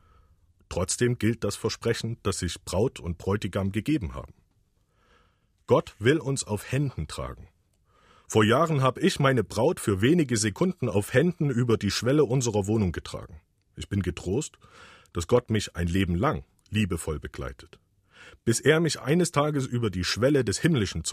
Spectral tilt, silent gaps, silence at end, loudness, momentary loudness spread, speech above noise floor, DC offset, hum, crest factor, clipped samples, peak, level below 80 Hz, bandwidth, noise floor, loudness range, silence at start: -5.5 dB/octave; none; 0 s; -26 LUFS; 12 LU; 42 dB; under 0.1%; none; 20 dB; under 0.1%; -6 dBFS; -48 dBFS; 15.5 kHz; -68 dBFS; 5 LU; 0.7 s